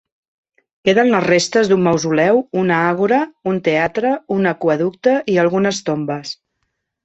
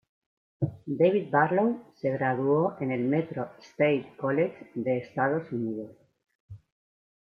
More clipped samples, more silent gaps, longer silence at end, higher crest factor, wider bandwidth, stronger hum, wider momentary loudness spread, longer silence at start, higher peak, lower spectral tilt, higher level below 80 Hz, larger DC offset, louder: neither; second, none vs 6.35-6.49 s; about the same, 0.7 s vs 0.65 s; about the same, 16 dB vs 20 dB; first, 8.4 kHz vs 6.8 kHz; neither; second, 7 LU vs 10 LU; first, 0.85 s vs 0.6 s; first, -2 dBFS vs -8 dBFS; second, -5.5 dB/octave vs -9 dB/octave; first, -58 dBFS vs -70 dBFS; neither; first, -16 LUFS vs -28 LUFS